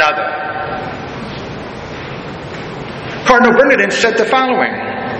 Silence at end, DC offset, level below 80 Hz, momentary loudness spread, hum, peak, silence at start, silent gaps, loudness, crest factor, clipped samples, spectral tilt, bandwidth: 0 s; under 0.1%; -42 dBFS; 17 LU; none; 0 dBFS; 0 s; none; -13 LUFS; 16 dB; under 0.1%; -4.5 dB/octave; 9.6 kHz